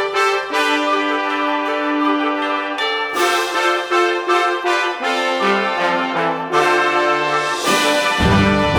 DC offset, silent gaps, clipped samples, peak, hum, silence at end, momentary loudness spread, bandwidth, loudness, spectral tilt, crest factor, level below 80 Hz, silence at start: under 0.1%; none; under 0.1%; -2 dBFS; none; 0 s; 4 LU; over 20 kHz; -16 LUFS; -4 dB/octave; 16 dB; -38 dBFS; 0 s